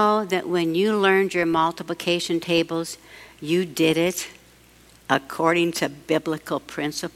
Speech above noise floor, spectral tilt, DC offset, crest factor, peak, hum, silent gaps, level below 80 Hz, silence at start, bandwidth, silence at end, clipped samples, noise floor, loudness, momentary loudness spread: 30 dB; -4.5 dB/octave; under 0.1%; 20 dB; -4 dBFS; none; none; -60 dBFS; 0 s; 16 kHz; 0.05 s; under 0.1%; -52 dBFS; -23 LUFS; 10 LU